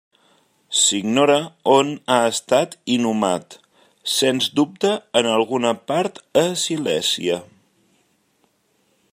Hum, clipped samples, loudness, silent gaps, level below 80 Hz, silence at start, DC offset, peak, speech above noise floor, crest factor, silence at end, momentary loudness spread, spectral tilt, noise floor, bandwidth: none; under 0.1%; -19 LUFS; none; -68 dBFS; 0.7 s; under 0.1%; -2 dBFS; 45 dB; 20 dB; 1.7 s; 6 LU; -3 dB/octave; -64 dBFS; 16 kHz